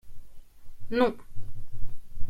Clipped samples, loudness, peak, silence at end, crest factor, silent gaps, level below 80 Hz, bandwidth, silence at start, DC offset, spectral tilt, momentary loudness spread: under 0.1%; -28 LUFS; -10 dBFS; 0 s; 14 dB; none; -40 dBFS; 5.2 kHz; 0.05 s; under 0.1%; -7 dB/octave; 21 LU